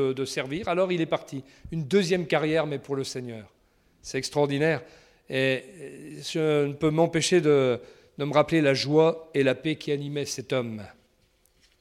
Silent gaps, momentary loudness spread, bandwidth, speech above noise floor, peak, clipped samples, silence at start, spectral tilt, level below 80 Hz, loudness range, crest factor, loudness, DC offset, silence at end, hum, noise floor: none; 15 LU; 15 kHz; 40 dB; -8 dBFS; under 0.1%; 0 s; -5 dB/octave; -60 dBFS; 6 LU; 18 dB; -26 LUFS; under 0.1%; 0.9 s; none; -65 dBFS